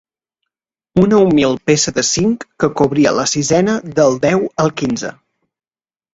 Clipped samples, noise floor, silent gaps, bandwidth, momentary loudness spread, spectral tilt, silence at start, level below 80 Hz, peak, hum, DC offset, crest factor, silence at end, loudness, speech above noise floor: under 0.1%; under -90 dBFS; none; 8.2 kHz; 8 LU; -4.5 dB/octave; 0.95 s; -48 dBFS; 0 dBFS; none; under 0.1%; 16 dB; 1.05 s; -14 LUFS; over 76 dB